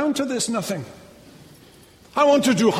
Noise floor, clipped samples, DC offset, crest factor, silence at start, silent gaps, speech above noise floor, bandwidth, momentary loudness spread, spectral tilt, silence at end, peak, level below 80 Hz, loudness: -49 dBFS; under 0.1%; under 0.1%; 16 dB; 0 s; none; 29 dB; 16 kHz; 14 LU; -4 dB/octave; 0 s; -6 dBFS; -62 dBFS; -21 LUFS